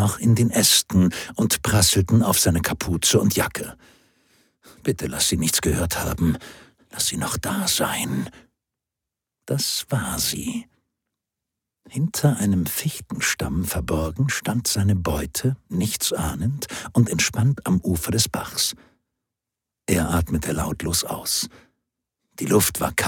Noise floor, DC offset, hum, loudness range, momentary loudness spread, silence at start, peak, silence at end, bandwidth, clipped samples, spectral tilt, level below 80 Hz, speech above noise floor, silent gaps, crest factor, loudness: -86 dBFS; under 0.1%; none; 6 LU; 10 LU; 0 s; -2 dBFS; 0 s; 19 kHz; under 0.1%; -4 dB/octave; -40 dBFS; 64 dB; none; 22 dB; -22 LUFS